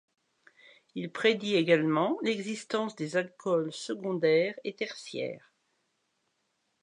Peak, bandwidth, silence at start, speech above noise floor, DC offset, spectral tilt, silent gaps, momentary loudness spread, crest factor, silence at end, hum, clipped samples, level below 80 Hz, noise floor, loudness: -10 dBFS; 11 kHz; 0.95 s; 48 dB; under 0.1%; -5 dB/octave; none; 12 LU; 20 dB; 1.45 s; none; under 0.1%; -84 dBFS; -78 dBFS; -30 LUFS